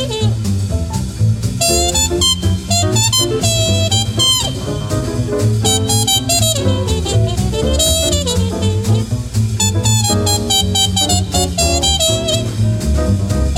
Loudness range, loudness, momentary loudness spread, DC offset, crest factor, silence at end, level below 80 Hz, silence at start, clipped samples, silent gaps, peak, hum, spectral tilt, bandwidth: 2 LU; -14 LUFS; 6 LU; under 0.1%; 14 dB; 0 s; -24 dBFS; 0 s; under 0.1%; none; -2 dBFS; none; -3.5 dB/octave; 16.5 kHz